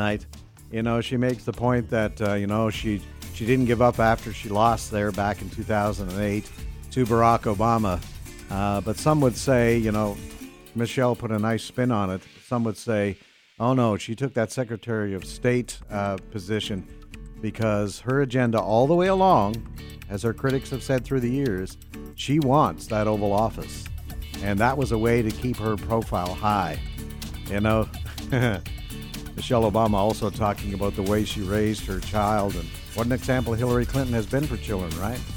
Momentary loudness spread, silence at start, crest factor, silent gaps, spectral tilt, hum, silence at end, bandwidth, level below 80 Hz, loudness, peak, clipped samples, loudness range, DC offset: 14 LU; 0 s; 20 dB; none; -6.5 dB/octave; none; 0 s; 17 kHz; -40 dBFS; -25 LUFS; -4 dBFS; under 0.1%; 4 LU; under 0.1%